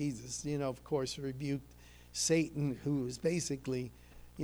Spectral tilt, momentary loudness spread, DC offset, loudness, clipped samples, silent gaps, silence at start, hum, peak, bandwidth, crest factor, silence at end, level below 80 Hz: -5 dB/octave; 9 LU; under 0.1%; -36 LUFS; under 0.1%; none; 0 s; 60 Hz at -60 dBFS; -20 dBFS; over 20 kHz; 18 dB; 0 s; -60 dBFS